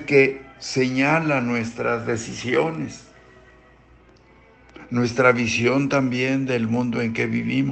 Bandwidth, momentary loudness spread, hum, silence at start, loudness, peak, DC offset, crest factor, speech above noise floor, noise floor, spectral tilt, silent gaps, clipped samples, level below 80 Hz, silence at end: 8.8 kHz; 9 LU; none; 0 s; -21 LUFS; -2 dBFS; under 0.1%; 20 dB; 31 dB; -52 dBFS; -5.5 dB/octave; none; under 0.1%; -56 dBFS; 0 s